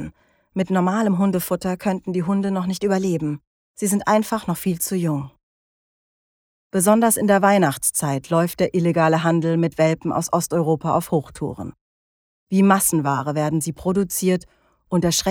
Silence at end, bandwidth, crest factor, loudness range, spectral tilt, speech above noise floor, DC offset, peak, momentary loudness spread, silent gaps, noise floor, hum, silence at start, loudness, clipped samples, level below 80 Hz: 0 s; 18.5 kHz; 20 dB; 4 LU; -5 dB/octave; 24 dB; under 0.1%; -2 dBFS; 10 LU; 3.47-3.74 s, 5.43-6.70 s, 11.81-12.47 s; -43 dBFS; none; 0 s; -20 LUFS; under 0.1%; -54 dBFS